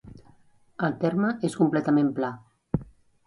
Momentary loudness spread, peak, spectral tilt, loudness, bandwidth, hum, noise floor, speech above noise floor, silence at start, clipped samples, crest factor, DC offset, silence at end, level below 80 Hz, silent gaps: 10 LU; -8 dBFS; -7.5 dB/octave; -26 LUFS; 11.5 kHz; none; -58 dBFS; 33 dB; 0.05 s; under 0.1%; 18 dB; under 0.1%; 0.45 s; -54 dBFS; none